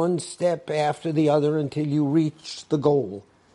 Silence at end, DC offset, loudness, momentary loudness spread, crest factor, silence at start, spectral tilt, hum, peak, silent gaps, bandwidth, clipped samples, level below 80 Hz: 0.35 s; under 0.1%; -23 LUFS; 7 LU; 16 dB; 0 s; -7 dB/octave; none; -6 dBFS; none; 11 kHz; under 0.1%; -68 dBFS